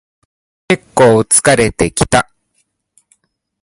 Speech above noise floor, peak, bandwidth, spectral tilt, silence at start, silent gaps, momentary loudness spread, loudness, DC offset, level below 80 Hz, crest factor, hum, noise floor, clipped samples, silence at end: 53 dB; 0 dBFS; 16 kHz; -4 dB/octave; 0.7 s; none; 9 LU; -11 LUFS; under 0.1%; -38 dBFS; 14 dB; none; -64 dBFS; under 0.1%; 1.4 s